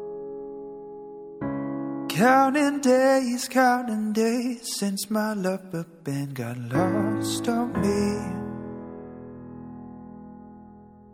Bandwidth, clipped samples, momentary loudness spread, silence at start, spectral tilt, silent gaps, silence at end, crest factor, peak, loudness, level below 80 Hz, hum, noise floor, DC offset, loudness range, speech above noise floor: 16.5 kHz; under 0.1%; 21 LU; 0 s; -5 dB/octave; none; 0.1 s; 20 dB; -6 dBFS; -25 LUFS; -56 dBFS; none; -48 dBFS; under 0.1%; 8 LU; 25 dB